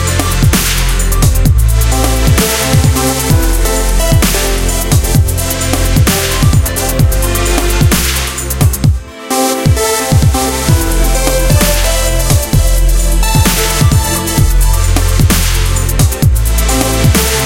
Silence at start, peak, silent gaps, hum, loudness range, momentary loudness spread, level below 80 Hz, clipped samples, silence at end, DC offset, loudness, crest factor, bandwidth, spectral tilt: 0 s; 0 dBFS; none; none; 1 LU; 3 LU; -14 dBFS; under 0.1%; 0 s; under 0.1%; -11 LUFS; 10 dB; 17 kHz; -4 dB/octave